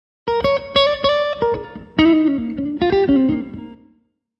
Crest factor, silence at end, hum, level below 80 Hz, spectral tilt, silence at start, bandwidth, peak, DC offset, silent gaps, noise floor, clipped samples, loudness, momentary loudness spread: 16 dB; 0.65 s; none; -44 dBFS; -7 dB/octave; 0.25 s; 7.6 kHz; -2 dBFS; under 0.1%; none; -60 dBFS; under 0.1%; -18 LUFS; 10 LU